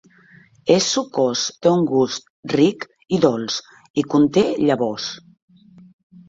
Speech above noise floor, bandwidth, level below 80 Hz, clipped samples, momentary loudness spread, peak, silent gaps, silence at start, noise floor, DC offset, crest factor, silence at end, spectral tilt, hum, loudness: 32 dB; 7.8 kHz; -60 dBFS; under 0.1%; 11 LU; -2 dBFS; 2.30-2.43 s, 3.90-3.94 s; 0.65 s; -50 dBFS; under 0.1%; 18 dB; 1.1 s; -4.5 dB/octave; none; -19 LUFS